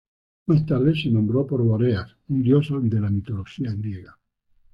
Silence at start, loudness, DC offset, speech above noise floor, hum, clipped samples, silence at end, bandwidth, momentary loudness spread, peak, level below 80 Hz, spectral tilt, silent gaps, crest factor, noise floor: 0.5 s; -22 LUFS; under 0.1%; 39 dB; none; under 0.1%; 0.7 s; 5.4 kHz; 11 LU; -8 dBFS; -52 dBFS; -10 dB/octave; none; 16 dB; -60 dBFS